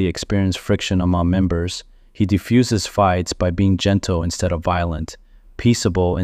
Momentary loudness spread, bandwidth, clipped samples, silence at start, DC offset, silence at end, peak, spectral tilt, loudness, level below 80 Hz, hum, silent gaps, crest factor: 7 LU; 15 kHz; under 0.1%; 0 s; under 0.1%; 0 s; -4 dBFS; -6 dB/octave; -19 LUFS; -36 dBFS; none; none; 14 dB